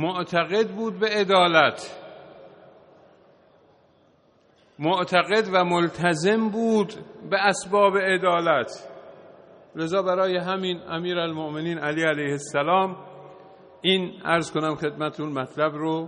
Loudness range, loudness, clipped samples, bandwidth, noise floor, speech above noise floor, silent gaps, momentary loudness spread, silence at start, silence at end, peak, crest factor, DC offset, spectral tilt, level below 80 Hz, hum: 5 LU; -23 LUFS; under 0.1%; 10 kHz; -60 dBFS; 37 dB; none; 11 LU; 0 s; 0 s; -2 dBFS; 22 dB; under 0.1%; -5 dB/octave; -68 dBFS; none